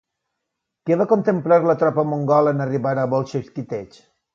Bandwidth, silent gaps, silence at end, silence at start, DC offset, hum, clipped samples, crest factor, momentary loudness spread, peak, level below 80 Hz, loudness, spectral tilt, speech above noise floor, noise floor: 7.2 kHz; none; 0.5 s; 0.85 s; under 0.1%; none; under 0.1%; 16 dB; 13 LU; -4 dBFS; -64 dBFS; -19 LUFS; -9 dB/octave; 61 dB; -80 dBFS